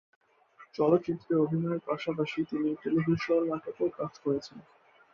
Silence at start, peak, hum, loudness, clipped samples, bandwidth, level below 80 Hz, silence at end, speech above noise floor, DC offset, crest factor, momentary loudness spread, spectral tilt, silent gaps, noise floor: 0.6 s; -12 dBFS; none; -30 LUFS; under 0.1%; 7 kHz; -68 dBFS; 0.55 s; 29 dB; under 0.1%; 18 dB; 7 LU; -8 dB/octave; none; -58 dBFS